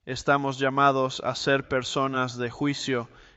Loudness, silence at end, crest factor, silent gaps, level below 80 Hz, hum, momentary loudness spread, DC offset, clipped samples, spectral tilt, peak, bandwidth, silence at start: -26 LUFS; 0.15 s; 18 dB; none; -58 dBFS; none; 7 LU; under 0.1%; under 0.1%; -5 dB/octave; -8 dBFS; 8.2 kHz; 0.05 s